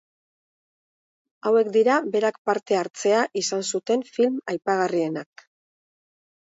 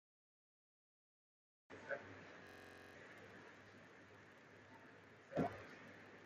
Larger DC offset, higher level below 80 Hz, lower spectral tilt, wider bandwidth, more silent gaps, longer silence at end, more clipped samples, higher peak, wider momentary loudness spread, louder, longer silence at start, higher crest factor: neither; about the same, -78 dBFS vs -82 dBFS; second, -3.5 dB/octave vs -6.5 dB/octave; second, 8 kHz vs 14.5 kHz; first, 2.38-2.45 s vs none; first, 1.25 s vs 0 s; neither; first, -8 dBFS vs -28 dBFS; second, 7 LU vs 18 LU; first, -23 LUFS vs -53 LUFS; second, 1.45 s vs 1.7 s; second, 18 dB vs 26 dB